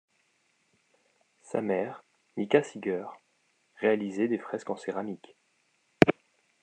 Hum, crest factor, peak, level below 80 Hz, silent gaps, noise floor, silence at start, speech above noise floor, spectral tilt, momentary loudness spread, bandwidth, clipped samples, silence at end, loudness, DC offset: none; 30 dB; -2 dBFS; -62 dBFS; none; -72 dBFS; 1.5 s; 42 dB; -6.5 dB/octave; 18 LU; 9.4 kHz; under 0.1%; 0.5 s; -29 LUFS; under 0.1%